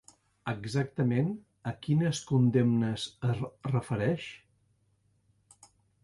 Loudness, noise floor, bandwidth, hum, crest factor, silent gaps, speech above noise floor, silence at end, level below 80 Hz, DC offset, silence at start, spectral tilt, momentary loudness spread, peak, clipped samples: -30 LUFS; -71 dBFS; 11.5 kHz; none; 18 dB; none; 42 dB; 1.65 s; -62 dBFS; under 0.1%; 0.45 s; -7 dB/octave; 12 LU; -14 dBFS; under 0.1%